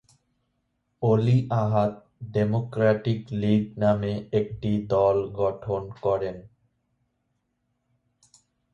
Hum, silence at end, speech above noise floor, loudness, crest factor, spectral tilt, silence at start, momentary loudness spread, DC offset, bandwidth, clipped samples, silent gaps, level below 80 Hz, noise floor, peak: none; 2.25 s; 52 dB; -25 LUFS; 18 dB; -9 dB/octave; 1 s; 8 LU; under 0.1%; 7.4 kHz; under 0.1%; none; -54 dBFS; -75 dBFS; -8 dBFS